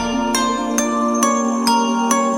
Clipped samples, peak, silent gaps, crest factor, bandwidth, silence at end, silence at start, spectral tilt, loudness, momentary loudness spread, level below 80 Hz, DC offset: under 0.1%; -2 dBFS; none; 14 dB; 17 kHz; 0 s; 0 s; -2.5 dB/octave; -17 LUFS; 2 LU; -44 dBFS; under 0.1%